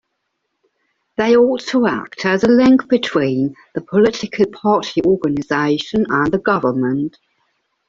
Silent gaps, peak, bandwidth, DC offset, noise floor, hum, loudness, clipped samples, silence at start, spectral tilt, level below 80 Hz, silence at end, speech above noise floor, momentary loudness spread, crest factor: none; -2 dBFS; 7.6 kHz; under 0.1%; -73 dBFS; none; -16 LUFS; under 0.1%; 1.2 s; -6 dB/octave; -52 dBFS; 0.8 s; 57 dB; 8 LU; 14 dB